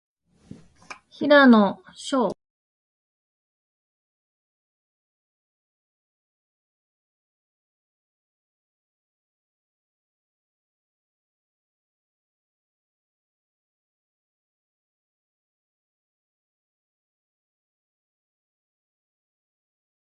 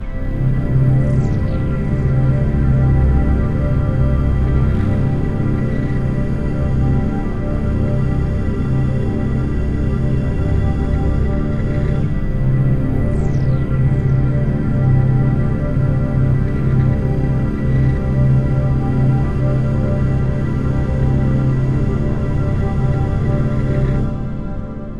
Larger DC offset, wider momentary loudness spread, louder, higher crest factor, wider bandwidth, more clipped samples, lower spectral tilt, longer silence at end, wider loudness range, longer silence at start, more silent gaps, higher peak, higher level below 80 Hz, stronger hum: second, under 0.1% vs 3%; first, 15 LU vs 4 LU; about the same, -19 LUFS vs -17 LUFS; first, 24 dB vs 12 dB; first, 10.5 kHz vs 5 kHz; neither; second, -5.5 dB/octave vs -10 dB/octave; first, 17.7 s vs 0 s; first, 11 LU vs 2 LU; first, 1.2 s vs 0 s; neither; second, -6 dBFS vs -2 dBFS; second, -74 dBFS vs -22 dBFS; neither